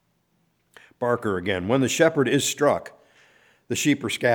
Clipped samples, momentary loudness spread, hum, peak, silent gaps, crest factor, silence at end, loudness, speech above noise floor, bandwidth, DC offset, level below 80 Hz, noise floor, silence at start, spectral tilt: under 0.1%; 8 LU; none; -4 dBFS; none; 20 dB; 0 s; -23 LUFS; 46 dB; over 20 kHz; under 0.1%; -62 dBFS; -68 dBFS; 1 s; -4 dB/octave